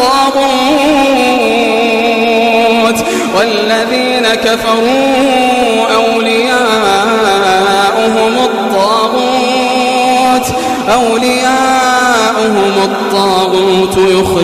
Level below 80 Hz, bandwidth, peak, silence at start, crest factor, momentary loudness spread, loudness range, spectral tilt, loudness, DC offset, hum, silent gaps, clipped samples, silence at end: -42 dBFS; 15.5 kHz; -2 dBFS; 0 s; 8 dB; 2 LU; 1 LU; -3.5 dB/octave; -9 LUFS; 0.2%; none; none; under 0.1%; 0 s